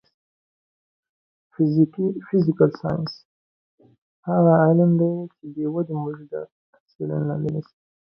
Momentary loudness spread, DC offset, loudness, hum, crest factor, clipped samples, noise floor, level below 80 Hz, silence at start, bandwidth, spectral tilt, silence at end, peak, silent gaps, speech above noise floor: 17 LU; under 0.1%; -22 LUFS; none; 20 dB; under 0.1%; under -90 dBFS; -62 dBFS; 1.6 s; 5.6 kHz; -11 dB/octave; 0.55 s; -4 dBFS; 3.25-3.78 s, 3.98-4.23 s, 6.52-6.73 s, 6.80-6.86 s, 6.95-6.99 s; over 69 dB